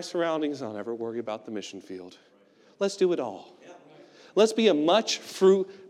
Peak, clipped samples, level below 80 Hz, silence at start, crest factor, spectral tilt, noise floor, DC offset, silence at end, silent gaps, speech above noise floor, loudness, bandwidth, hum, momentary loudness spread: -8 dBFS; under 0.1%; under -90 dBFS; 0 s; 20 dB; -4.5 dB/octave; -52 dBFS; under 0.1%; 0 s; none; 26 dB; -26 LUFS; 13 kHz; none; 17 LU